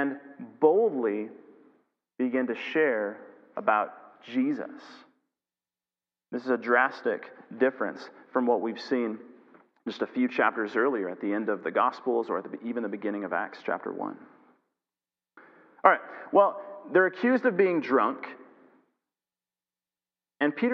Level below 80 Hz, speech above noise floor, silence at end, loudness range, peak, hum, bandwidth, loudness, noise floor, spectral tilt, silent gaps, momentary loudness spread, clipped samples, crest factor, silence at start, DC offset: -90 dBFS; over 63 dB; 0 s; 6 LU; -2 dBFS; none; 6.6 kHz; -27 LUFS; under -90 dBFS; -7 dB/octave; none; 16 LU; under 0.1%; 26 dB; 0 s; under 0.1%